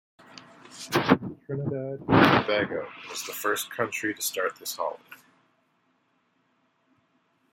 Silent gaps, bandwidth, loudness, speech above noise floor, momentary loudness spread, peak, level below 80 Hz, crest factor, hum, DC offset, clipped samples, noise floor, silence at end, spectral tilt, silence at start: none; 16.5 kHz; -26 LUFS; 44 dB; 22 LU; -2 dBFS; -60 dBFS; 28 dB; none; under 0.1%; under 0.1%; -70 dBFS; 2.4 s; -4.5 dB/octave; 0.35 s